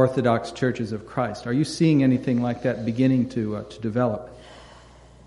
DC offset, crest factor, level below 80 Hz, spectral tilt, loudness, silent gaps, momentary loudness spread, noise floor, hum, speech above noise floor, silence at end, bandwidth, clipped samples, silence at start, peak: under 0.1%; 18 dB; -54 dBFS; -7 dB/octave; -24 LUFS; none; 10 LU; -48 dBFS; none; 26 dB; 0.5 s; 11.5 kHz; under 0.1%; 0 s; -4 dBFS